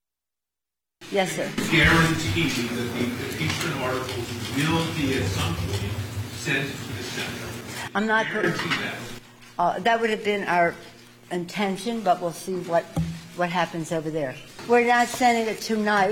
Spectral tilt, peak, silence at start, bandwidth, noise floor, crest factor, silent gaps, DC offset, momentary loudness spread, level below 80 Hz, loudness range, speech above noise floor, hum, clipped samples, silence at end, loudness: -4.5 dB/octave; -8 dBFS; 1 s; 17 kHz; -89 dBFS; 18 dB; none; under 0.1%; 12 LU; -46 dBFS; 4 LU; 65 dB; none; under 0.1%; 0 s; -24 LUFS